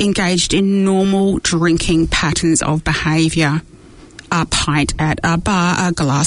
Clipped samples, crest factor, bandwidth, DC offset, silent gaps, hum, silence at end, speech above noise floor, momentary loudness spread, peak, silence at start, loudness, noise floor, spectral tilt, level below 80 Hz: under 0.1%; 12 dB; 11 kHz; under 0.1%; none; none; 0 s; 24 dB; 3 LU; -2 dBFS; 0 s; -15 LUFS; -39 dBFS; -4.5 dB/octave; -32 dBFS